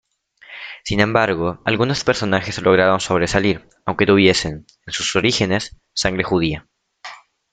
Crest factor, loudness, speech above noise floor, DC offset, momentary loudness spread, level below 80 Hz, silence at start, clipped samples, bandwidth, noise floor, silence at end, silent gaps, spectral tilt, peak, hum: 20 dB; -18 LUFS; 29 dB; under 0.1%; 19 LU; -44 dBFS; 0.5 s; under 0.1%; 9.4 kHz; -47 dBFS; 0.35 s; none; -4.5 dB/octave; 0 dBFS; none